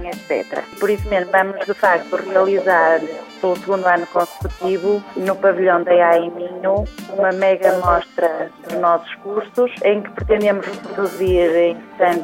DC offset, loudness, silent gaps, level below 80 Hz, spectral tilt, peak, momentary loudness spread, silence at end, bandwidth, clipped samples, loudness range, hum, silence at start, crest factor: under 0.1%; -18 LUFS; none; -38 dBFS; -6 dB/octave; -2 dBFS; 9 LU; 0 s; 16.5 kHz; under 0.1%; 2 LU; none; 0 s; 16 dB